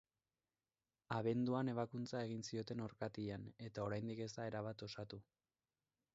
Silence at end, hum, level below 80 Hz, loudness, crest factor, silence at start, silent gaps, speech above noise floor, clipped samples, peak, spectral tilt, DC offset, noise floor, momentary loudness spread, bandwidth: 0.95 s; none; -76 dBFS; -45 LUFS; 18 dB; 1.1 s; none; over 46 dB; under 0.1%; -28 dBFS; -6 dB/octave; under 0.1%; under -90 dBFS; 11 LU; 7.6 kHz